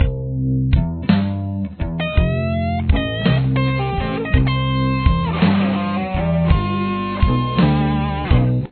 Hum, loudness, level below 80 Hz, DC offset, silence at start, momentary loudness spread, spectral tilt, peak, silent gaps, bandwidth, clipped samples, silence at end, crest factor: none; -19 LUFS; -24 dBFS; under 0.1%; 0 s; 5 LU; -11 dB/octave; 0 dBFS; none; 4.5 kHz; under 0.1%; 0.05 s; 16 dB